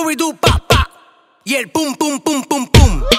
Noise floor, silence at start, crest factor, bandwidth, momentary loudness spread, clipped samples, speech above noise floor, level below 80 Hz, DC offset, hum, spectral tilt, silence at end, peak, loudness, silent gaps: -49 dBFS; 0 s; 14 dB; 16 kHz; 8 LU; under 0.1%; 31 dB; -20 dBFS; under 0.1%; none; -4.5 dB/octave; 0 s; 0 dBFS; -14 LUFS; none